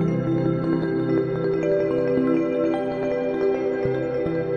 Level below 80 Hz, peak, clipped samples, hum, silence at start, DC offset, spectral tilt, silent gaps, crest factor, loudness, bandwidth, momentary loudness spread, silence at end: -50 dBFS; -10 dBFS; under 0.1%; none; 0 s; under 0.1%; -9 dB/octave; none; 12 dB; -23 LUFS; 6.8 kHz; 3 LU; 0 s